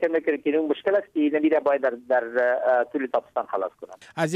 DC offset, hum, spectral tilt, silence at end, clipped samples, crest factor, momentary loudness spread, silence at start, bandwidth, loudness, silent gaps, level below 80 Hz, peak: under 0.1%; none; -6 dB/octave; 0 s; under 0.1%; 14 dB; 8 LU; 0 s; 11.5 kHz; -24 LUFS; none; -72 dBFS; -10 dBFS